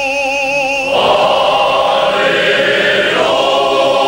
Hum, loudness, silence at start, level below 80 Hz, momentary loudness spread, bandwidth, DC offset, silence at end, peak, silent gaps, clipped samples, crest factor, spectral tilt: none; -11 LUFS; 0 s; -46 dBFS; 3 LU; 16.5 kHz; under 0.1%; 0 s; 0 dBFS; none; under 0.1%; 10 dB; -2.5 dB/octave